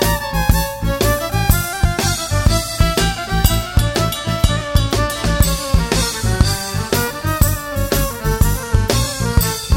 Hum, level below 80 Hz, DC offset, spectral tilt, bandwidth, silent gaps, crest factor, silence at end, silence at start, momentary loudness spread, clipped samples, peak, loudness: none; -20 dBFS; under 0.1%; -4.5 dB/octave; 16.5 kHz; none; 16 dB; 0 s; 0 s; 3 LU; under 0.1%; 0 dBFS; -17 LUFS